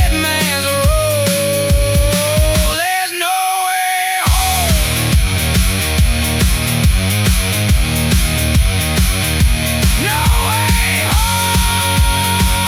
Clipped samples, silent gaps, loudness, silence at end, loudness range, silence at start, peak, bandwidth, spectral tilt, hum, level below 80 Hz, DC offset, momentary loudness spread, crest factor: under 0.1%; none; -14 LUFS; 0 s; 1 LU; 0 s; -2 dBFS; 18 kHz; -3.5 dB/octave; none; -18 dBFS; under 0.1%; 1 LU; 12 dB